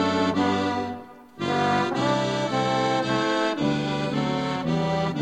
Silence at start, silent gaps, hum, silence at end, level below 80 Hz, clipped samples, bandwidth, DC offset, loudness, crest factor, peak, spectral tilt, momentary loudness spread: 0 s; none; none; 0 s; -54 dBFS; under 0.1%; 11 kHz; under 0.1%; -24 LUFS; 16 dB; -10 dBFS; -5.5 dB/octave; 4 LU